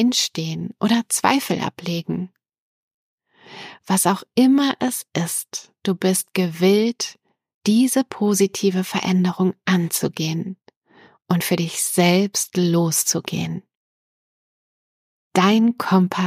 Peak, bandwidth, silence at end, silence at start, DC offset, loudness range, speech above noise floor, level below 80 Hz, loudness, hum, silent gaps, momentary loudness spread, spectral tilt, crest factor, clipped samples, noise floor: -2 dBFS; 15.5 kHz; 0 s; 0 s; under 0.1%; 4 LU; 33 dB; -68 dBFS; -20 LUFS; none; 2.58-3.18 s, 7.54-7.61 s, 10.76-10.82 s, 13.75-15.31 s; 11 LU; -4.5 dB/octave; 18 dB; under 0.1%; -53 dBFS